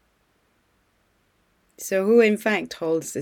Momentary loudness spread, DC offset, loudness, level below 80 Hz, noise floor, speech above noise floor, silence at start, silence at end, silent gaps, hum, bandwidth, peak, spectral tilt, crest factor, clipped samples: 9 LU; under 0.1%; -21 LUFS; -70 dBFS; -66 dBFS; 45 dB; 1.8 s; 0 s; none; none; 17.5 kHz; -6 dBFS; -4.5 dB/octave; 18 dB; under 0.1%